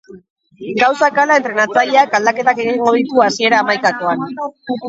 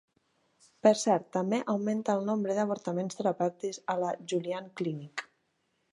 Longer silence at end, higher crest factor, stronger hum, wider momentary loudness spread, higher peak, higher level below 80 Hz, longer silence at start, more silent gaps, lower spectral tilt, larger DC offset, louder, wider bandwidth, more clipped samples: second, 0 s vs 0.7 s; second, 14 dB vs 22 dB; neither; about the same, 11 LU vs 10 LU; first, 0 dBFS vs -10 dBFS; first, -64 dBFS vs -82 dBFS; second, 0.1 s vs 0.85 s; first, 0.30-0.36 s vs none; second, -3.5 dB/octave vs -5.5 dB/octave; neither; first, -14 LUFS vs -31 LUFS; second, 8 kHz vs 11.5 kHz; neither